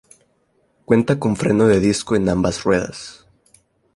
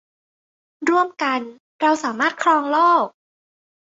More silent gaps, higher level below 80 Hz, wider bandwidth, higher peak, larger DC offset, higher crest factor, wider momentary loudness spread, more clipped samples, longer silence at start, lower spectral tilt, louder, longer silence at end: second, none vs 1.60-1.79 s; first, -44 dBFS vs -72 dBFS; first, 11.5 kHz vs 8 kHz; about the same, -2 dBFS vs -4 dBFS; neither; about the same, 18 dB vs 16 dB; about the same, 11 LU vs 10 LU; neither; about the same, 0.9 s vs 0.8 s; first, -6 dB/octave vs -3 dB/octave; about the same, -18 LUFS vs -19 LUFS; about the same, 0.85 s vs 0.85 s